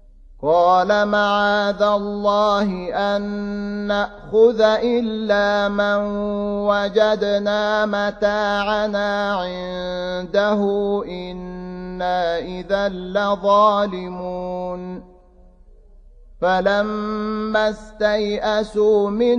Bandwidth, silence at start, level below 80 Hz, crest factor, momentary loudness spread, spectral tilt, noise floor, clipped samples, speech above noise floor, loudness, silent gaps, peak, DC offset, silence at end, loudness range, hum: 9 kHz; 0.3 s; -46 dBFS; 16 dB; 11 LU; -5.5 dB/octave; -48 dBFS; under 0.1%; 29 dB; -19 LUFS; none; -2 dBFS; under 0.1%; 0 s; 5 LU; none